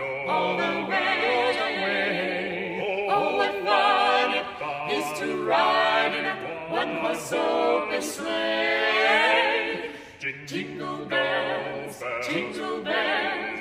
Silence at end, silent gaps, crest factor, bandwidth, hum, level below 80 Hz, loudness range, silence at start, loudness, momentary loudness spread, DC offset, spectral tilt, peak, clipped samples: 0 s; none; 18 dB; 15.5 kHz; none; -64 dBFS; 4 LU; 0 s; -24 LUFS; 11 LU; under 0.1%; -3.5 dB/octave; -8 dBFS; under 0.1%